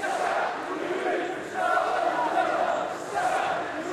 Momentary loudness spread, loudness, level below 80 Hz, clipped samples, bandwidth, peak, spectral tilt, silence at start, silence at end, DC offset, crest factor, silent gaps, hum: 5 LU; -27 LUFS; -68 dBFS; under 0.1%; 14 kHz; -12 dBFS; -3.5 dB/octave; 0 s; 0 s; under 0.1%; 16 dB; none; none